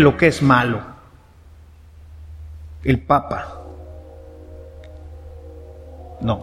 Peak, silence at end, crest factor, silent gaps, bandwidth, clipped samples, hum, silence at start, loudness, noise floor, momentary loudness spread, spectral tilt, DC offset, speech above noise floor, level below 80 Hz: 0 dBFS; 0 s; 22 dB; none; 14 kHz; under 0.1%; none; 0 s; -18 LUFS; -46 dBFS; 25 LU; -7 dB/octave; under 0.1%; 30 dB; -38 dBFS